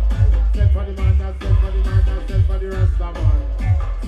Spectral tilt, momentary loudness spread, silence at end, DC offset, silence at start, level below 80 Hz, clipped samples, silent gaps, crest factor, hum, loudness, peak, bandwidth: -8 dB/octave; 3 LU; 0 s; under 0.1%; 0 s; -18 dBFS; under 0.1%; none; 12 dB; none; -19 LUFS; -4 dBFS; 5.2 kHz